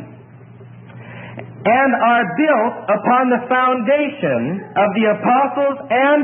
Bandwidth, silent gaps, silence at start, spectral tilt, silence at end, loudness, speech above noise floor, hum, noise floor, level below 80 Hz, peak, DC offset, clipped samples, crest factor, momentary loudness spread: 3.8 kHz; none; 0 s; -11 dB/octave; 0 s; -16 LUFS; 24 dB; none; -40 dBFS; -66 dBFS; -2 dBFS; under 0.1%; under 0.1%; 14 dB; 8 LU